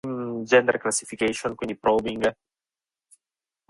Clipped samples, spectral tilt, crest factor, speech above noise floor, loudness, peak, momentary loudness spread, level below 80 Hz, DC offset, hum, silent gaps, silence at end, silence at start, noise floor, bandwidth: under 0.1%; -3.5 dB/octave; 22 dB; over 67 dB; -24 LUFS; -4 dBFS; 10 LU; -58 dBFS; under 0.1%; none; none; 1.35 s; 0.05 s; under -90 dBFS; 11.5 kHz